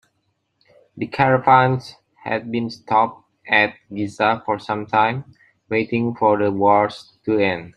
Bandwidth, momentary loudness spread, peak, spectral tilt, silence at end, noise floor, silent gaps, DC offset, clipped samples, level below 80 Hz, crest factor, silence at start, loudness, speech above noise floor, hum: 10 kHz; 13 LU; -2 dBFS; -7 dB/octave; 0.05 s; -70 dBFS; none; under 0.1%; under 0.1%; -60 dBFS; 18 dB; 0.95 s; -19 LUFS; 51 dB; none